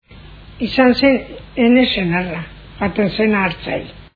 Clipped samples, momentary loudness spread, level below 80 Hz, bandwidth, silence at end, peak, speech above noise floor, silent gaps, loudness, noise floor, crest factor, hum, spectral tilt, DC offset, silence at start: under 0.1%; 14 LU; -40 dBFS; 5 kHz; 0.1 s; 0 dBFS; 23 dB; none; -16 LUFS; -39 dBFS; 16 dB; none; -8 dB/octave; under 0.1%; 0.1 s